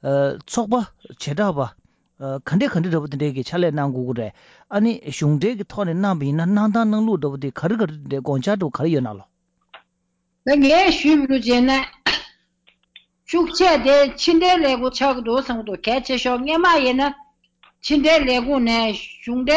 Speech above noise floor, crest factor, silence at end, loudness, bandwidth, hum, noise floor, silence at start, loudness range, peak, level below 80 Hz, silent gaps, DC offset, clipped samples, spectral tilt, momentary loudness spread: 52 dB; 12 dB; 0 s; -19 LUFS; 8 kHz; none; -71 dBFS; 0.05 s; 5 LU; -8 dBFS; -46 dBFS; none; under 0.1%; under 0.1%; -5.5 dB/octave; 12 LU